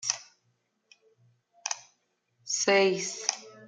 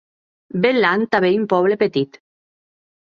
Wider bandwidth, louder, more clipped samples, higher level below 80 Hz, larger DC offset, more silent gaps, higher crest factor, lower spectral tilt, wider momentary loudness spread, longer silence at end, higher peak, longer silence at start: first, 10 kHz vs 6.8 kHz; second, -28 LUFS vs -17 LUFS; neither; second, -84 dBFS vs -62 dBFS; neither; neither; first, 26 dB vs 18 dB; second, -1.5 dB/octave vs -7.5 dB/octave; first, 15 LU vs 9 LU; second, 0 s vs 1.1 s; second, -6 dBFS vs -2 dBFS; second, 0 s vs 0.55 s